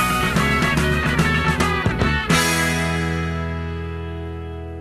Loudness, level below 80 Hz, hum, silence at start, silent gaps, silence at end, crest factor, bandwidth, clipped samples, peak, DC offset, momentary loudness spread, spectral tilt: -20 LUFS; -30 dBFS; none; 0 s; none; 0 s; 16 dB; 15.5 kHz; under 0.1%; -4 dBFS; 0.2%; 12 LU; -4.5 dB/octave